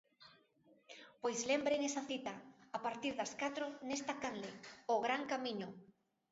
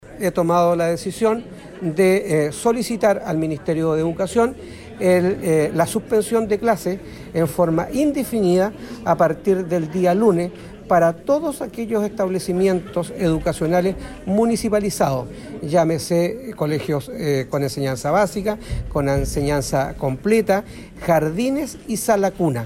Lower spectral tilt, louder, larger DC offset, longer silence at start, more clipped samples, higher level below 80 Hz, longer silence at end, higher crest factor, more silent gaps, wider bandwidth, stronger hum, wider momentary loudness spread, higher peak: second, -2 dB/octave vs -6 dB/octave; second, -41 LUFS vs -20 LUFS; neither; first, 0.2 s vs 0.05 s; neither; second, -82 dBFS vs -40 dBFS; first, 0.45 s vs 0 s; about the same, 18 dB vs 14 dB; neither; second, 7.6 kHz vs 16.5 kHz; neither; first, 15 LU vs 8 LU; second, -24 dBFS vs -4 dBFS